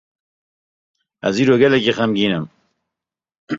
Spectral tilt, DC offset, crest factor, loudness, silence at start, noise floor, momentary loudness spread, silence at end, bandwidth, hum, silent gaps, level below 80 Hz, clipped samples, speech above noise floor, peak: -6 dB/octave; under 0.1%; 18 dB; -17 LUFS; 1.25 s; -86 dBFS; 12 LU; 0 s; 7.6 kHz; none; 3.38-3.47 s; -58 dBFS; under 0.1%; 70 dB; -2 dBFS